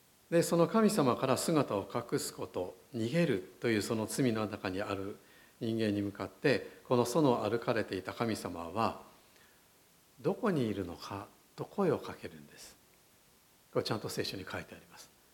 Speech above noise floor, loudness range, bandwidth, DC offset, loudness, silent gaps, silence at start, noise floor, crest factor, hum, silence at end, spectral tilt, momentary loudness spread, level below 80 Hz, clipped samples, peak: 32 dB; 7 LU; 17.5 kHz; under 0.1%; -34 LUFS; none; 0.3 s; -65 dBFS; 20 dB; none; 0.3 s; -5.5 dB/octave; 16 LU; -70 dBFS; under 0.1%; -14 dBFS